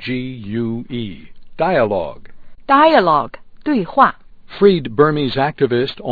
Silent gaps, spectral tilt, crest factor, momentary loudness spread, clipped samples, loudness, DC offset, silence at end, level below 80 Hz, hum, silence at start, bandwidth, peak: none; -9 dB/octave; 16 dB; 15 LU; under 0.1%; -16 LUFS; under 0.1%; 0 s; -44 dBFS; none; 0 s; 4.9 kHz; 0 dBFS